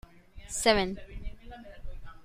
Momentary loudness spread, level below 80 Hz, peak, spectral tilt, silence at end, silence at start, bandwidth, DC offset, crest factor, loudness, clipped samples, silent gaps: 24 LU; -44 dBFS; -8 dBFS; -3 dB/octave; 0 s; 0.15 s; 16 kHz; under 0.1%; 24 dB; -28 LUFS; under 0.1%; none